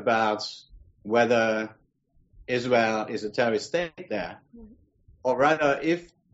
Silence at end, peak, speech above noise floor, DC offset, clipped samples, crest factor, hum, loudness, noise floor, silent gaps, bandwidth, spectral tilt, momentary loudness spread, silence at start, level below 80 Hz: 0.3 s; -10 dBFS; 40 dB; under 0.1%; under 0.1%; 18 dB; none; -26 LUFS; -65 dBFS; none; 8 kHz; -3 dB/octave; 14 LU; 0 s; -60 dBFS